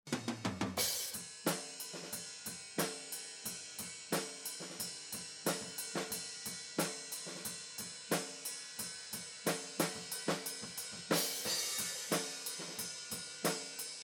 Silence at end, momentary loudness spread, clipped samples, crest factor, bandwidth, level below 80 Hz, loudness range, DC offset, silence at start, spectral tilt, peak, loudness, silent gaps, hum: 0 s; 9 LU; under 0.1%; 24 dB; over 20 kHz; -80 dBFS; 4 LU; under 0.1%; 0.05 s; -2 dB/octave; -18 dBFS; -39 LUFS; none; none